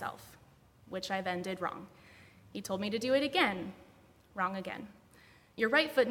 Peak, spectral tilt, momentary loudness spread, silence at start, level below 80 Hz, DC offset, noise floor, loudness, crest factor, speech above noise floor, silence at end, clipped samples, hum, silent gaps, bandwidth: -14 dBFS; -4.5 dB/octave; 20 LU; 0 s; -70 dBFS; under 0.1%; -62 dBFS; -33 LUFS; 22 dB; 28 dB; 0 s; under 0.1%; none; none; 18 kHz